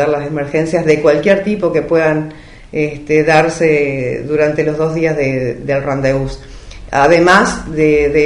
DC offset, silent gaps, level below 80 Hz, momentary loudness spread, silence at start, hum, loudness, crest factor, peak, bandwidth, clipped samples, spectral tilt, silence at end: 0.3%; none; -36 dBFS; 9 LU; 0 s; none; -13 LUFS; 14 dB; 0 dBFS; 11 kHz; under 0.1%; -6 dB/octave; 0 s